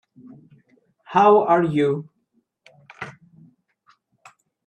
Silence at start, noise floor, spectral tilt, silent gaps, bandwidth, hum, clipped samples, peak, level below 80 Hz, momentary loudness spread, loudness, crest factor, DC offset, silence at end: 1.1 s; -69 dBFS; -7.5 dB/octave; none; 8.6 kHz; none; under 0.1%; -4 dBFS; -68 dBFS; 22 LU; -18 LUFS; 20 dB; under 0.1%; 1.55 s